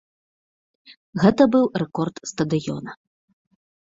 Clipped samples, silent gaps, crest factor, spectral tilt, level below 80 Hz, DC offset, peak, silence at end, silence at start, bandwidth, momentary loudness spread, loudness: under 0.1%; 0.97-1.13 s; 20 dB; -6.5 dB/octave; -58 dBFS; under 0.1%; -2 dBFS; 0.95 s; 0.9 s; 7.8 kHz; 16 LU; -21 LUFS